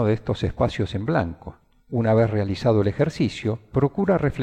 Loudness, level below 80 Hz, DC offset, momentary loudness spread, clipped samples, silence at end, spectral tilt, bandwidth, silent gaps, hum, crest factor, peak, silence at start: -23 LUFS; -42 dBFS; under 0.1%; 8 LU; under 0.1%; 0 s; -8 dB/octave; 9 kHz; none; none; 16 dB; -6 dBFS; 0 s